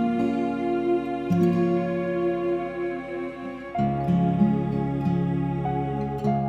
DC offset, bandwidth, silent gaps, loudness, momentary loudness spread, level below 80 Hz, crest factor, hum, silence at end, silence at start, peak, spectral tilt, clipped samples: under 0.1%; 7 kHz; none; -25 LUFS; 9 LU; -48 dBFS; 14 dB; none; 0 s; 0 s; -10 dBFS; -9.5 dB/octave; under 0.1%